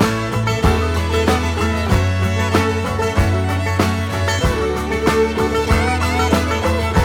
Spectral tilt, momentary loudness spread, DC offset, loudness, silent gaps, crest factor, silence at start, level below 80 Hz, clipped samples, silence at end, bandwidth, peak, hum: -5.5 dB/octave; 3 LU; under 0.1%; -17 LUFS; none; 16 dB; 0 s; -26 dBFS; under 0.1%; 0 s; 17 kHz; 0 dBFS; none